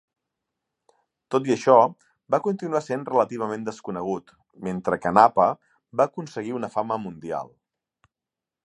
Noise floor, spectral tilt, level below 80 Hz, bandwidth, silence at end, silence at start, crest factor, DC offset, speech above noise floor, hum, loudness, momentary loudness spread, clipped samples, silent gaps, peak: -89 dBFS; -6.5 dB/octave; -64 dBFS; 11 kHz; 1.2 s; 1.3 s; 24 dB; under 0.1%; 66 dB; none; -24 LUFS; 15 LU; under 0.1%; none; 0 dBFS